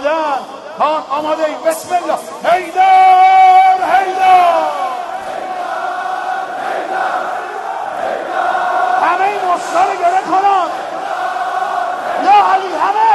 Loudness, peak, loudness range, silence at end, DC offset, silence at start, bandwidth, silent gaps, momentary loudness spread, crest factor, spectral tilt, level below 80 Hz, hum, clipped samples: -13 LUFS; 0 dBFS; 9 LU; 0 s; under 0.1%; 0 s; 12 kHz; none; 13 LU; 14 dB; -2.5 dB/octave; -60 dBFS; none; under 0.1%